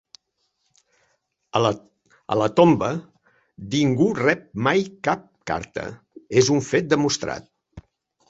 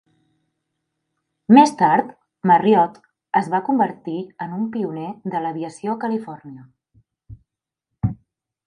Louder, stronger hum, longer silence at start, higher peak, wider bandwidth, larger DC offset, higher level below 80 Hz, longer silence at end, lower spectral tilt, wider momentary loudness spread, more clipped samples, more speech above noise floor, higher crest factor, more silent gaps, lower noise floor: about the same, -22 LUFS vs -20 LUFS; neither; about the same, 1.55 s vs 1.5 s; about the same, -2 dBFS vs 0 dBFS; second, 8 kHz vs 11.5 kHz; neither; about the same, -56 dBFS vs -52 dBFS; about the same, 0.5 s vs 0.5 s; second, -5 dB/octave vs -6.5 dB/octave; about the same, 15 LU vs 16 LU; neither; second, 52 dB vs 65 dB; about the same, 22 dB vs 20 dB; neither; second, -73 dBFS vs -83 dBFS